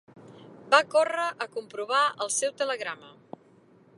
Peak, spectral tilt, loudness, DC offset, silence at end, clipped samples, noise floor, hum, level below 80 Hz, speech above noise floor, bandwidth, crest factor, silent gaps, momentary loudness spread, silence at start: -6 dBFS; -0.5 dB/octave; -26 LUFS; under 0.1%; 0.9 s; under 0.1%; -58 dBFS; none; -82 dBFS; 31 dB; 11.5 kHz; 24 dB; none; 14 LU; 0.15 s